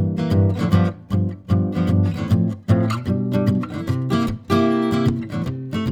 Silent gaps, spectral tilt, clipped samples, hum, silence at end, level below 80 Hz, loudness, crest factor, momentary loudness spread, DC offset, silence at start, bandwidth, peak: none; -8.5 dB/octave; under 0.1%; none; 0 s; -44 dBFS; -20 LUFS; 16 dB; 6 LU; under 0.1%; 0 s; 13.5 kHz; -4 dBFS